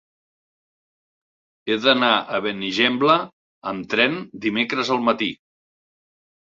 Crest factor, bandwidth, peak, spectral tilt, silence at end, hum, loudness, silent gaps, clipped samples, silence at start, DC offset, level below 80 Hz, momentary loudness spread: 22 dB; 7.8 kHz; 0 dBFS; -4.5 dB/octave; 1.15 s; none; -20 LUFS; 3.33-3.62 s; under 0.1%; 1.65 s; under 0.1%; -64 dBFS; 13 LU